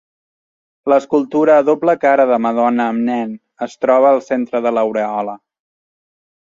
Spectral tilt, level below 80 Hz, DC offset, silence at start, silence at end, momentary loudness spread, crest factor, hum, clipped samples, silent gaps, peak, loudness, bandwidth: -6.5 dB/octave; -66 dBFS; under 0.1%; 0.85 s; 1.15 s; 12 LU; 14 dB; none; under 0.1%; none; -2 dBFS; -15 LUFS; 7.6 kHz